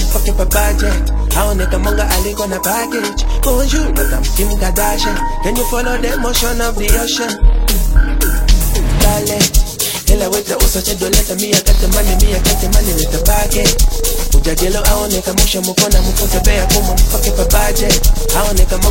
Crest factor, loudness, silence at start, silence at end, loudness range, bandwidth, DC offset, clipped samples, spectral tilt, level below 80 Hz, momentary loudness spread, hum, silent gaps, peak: 12 dB; -14 LUFS; 0 s; 0 s; 3 LU; 17 kHz; under 0.1%; under 0.1%; -3.5 dB/octave; -14 dBFS; 4 LU; none; none; 0 dBFS